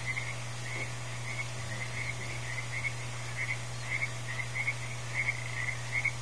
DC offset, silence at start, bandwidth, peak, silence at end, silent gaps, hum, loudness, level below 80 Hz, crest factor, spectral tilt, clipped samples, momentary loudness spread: 0.7%; 0 s; 11 kHz; -18 dBFS; 0 s; none; none; -35 LUFS; -58 dBFS; 18 dB; -3 dB/octave; under 0.1%; 6 LU